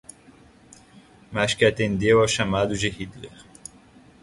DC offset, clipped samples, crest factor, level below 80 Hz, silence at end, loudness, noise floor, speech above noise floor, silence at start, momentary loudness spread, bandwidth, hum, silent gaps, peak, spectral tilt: under 0.1%; under 0.1%; 22 dB; -48 dBFS; 0.95 s; -22 LUFS; -52 dBFS; 30 dB; 1.3 s; 24 LU; 11.5 kHz; none; none; -4 dBFS; -4.5 dB/octave